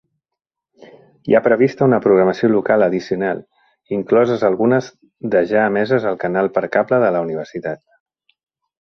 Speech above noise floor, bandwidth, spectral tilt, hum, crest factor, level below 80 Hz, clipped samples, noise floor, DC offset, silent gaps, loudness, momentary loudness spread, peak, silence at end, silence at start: 30 dB; 6.4 kHz; -8 dB/octave; none; 18 dB; -58 dBFS; under 0.1%; -46 dBFS; under 0.1%; none; -17 LUFS; 13 LU; 0 dBFS; 1.05 s; 1.25 s